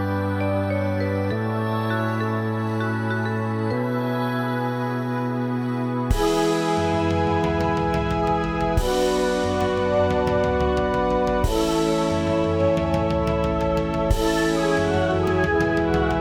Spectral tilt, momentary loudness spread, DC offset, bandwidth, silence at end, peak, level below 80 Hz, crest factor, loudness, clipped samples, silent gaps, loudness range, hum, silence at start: -6.5 dB/octave; 4 LU; under 0.1%; 17 kHz; 0 s; -6 dBFS; -34 dBFS; 16 dB; -22 LUFS; under 0.1%; none; 3 LU; none; 0 s